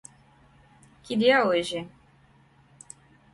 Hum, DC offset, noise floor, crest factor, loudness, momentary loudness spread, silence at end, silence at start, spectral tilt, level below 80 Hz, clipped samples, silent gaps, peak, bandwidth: none; under 0.1%; -59 dBFS; 20 dB; -24 LUFS; 27 LU; 1.45 s; 1.05 s; -4.5 dB/octave; -66 dBFS; under 0.1%; none; -8 dBFS; 11.5 kHz